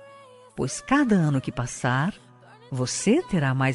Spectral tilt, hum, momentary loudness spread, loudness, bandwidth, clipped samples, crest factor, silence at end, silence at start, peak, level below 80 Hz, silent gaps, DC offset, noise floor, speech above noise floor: -5.5 dB/octave; none; 10 LU; -24 LUFS; 11.5 kHz; under 0.1%; 16 dB; 0 s; 0 s; -8 dBFS; -52 dBFS; none; under 0.1%; -49 dBFS; 26 dB